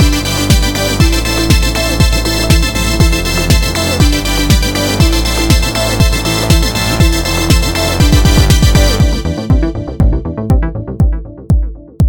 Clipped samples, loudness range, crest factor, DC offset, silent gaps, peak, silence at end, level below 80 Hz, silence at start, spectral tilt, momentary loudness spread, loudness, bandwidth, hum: 0.4%; 1 LU; 10 dB; under 0.1%; none; 0 dBFS; 0 s; -14 dBFS; 0 s; -4.5 dB/octave; 6 LU; -12 LUFS; 19.5 kHz; none